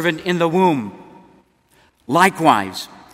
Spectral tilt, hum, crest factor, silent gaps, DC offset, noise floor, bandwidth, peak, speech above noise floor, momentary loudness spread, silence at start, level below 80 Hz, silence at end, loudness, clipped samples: -5 dB/octave; none; 20 dB; none; under 0.1%; -56 dBFS; 16 kHz; 0 dBFS; 40 dB; 15 LU; 0 s; -60 dBFS; 0.25 s; -17 LUFS; under 0.1%